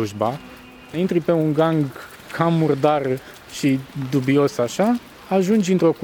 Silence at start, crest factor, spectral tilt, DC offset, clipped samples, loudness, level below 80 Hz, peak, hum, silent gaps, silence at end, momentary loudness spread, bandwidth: 0 s; 16 dB; -6.5 dB/octave; under 0.1%; under 0.1%; -20 LUFS; -56 dBFS; -4 dBFS; none; none; 0 s; 12 LU; 19 kHz